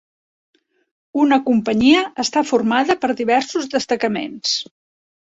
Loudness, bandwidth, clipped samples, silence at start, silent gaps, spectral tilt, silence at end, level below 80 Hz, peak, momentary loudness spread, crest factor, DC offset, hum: -18 LUFS; 8 kHz; under 0.1%; 1.15 s; none; -3.5 dB/octave; 0.6 s; -58 dBFS; -2 dBFS; 8 LU; 16 dB; under 0.1%; none